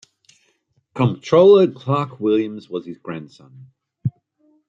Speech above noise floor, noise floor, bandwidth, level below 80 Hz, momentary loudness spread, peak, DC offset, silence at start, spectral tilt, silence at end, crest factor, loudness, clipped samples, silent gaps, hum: 48 dB; -65 dBFS; 7.4 kHz; -64 dBFS; 20 LU; -2 dBFS; under 0.1%; 0.95 s; -8 dB/octave; 0.6 s; 18 dB; -18 LUFS; under 0.1%; none; none